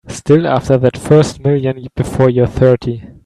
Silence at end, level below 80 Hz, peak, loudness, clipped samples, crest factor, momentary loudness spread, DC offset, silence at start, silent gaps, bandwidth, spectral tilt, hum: 0.15 s; -38 dBFS; 0 dBFS; -13 LUFS; under 0.1%; 12 dB; 9 LU; under 0.1%; 0.05 s; none; 12.5 kHz; -7.5 dB/octave; none